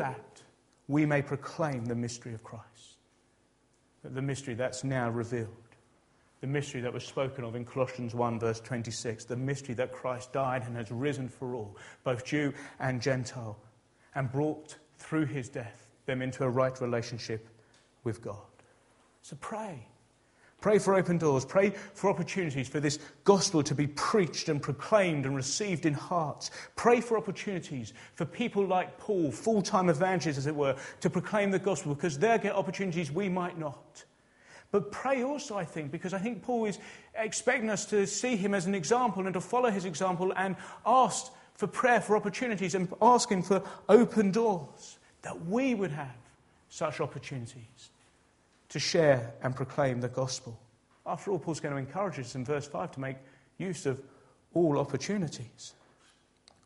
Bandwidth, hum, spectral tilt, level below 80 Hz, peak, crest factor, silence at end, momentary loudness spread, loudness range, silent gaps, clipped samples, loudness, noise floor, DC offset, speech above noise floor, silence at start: 11.5 kHz; none; -5 dB/octave; -68 dBFS; -6 dBFS; 24 dB; 0.95 s; 15 LU; 8 LU; none; under 0.1%; -31 LUFS; -69 dBFS; under 0.1%; 38 dB; 0 s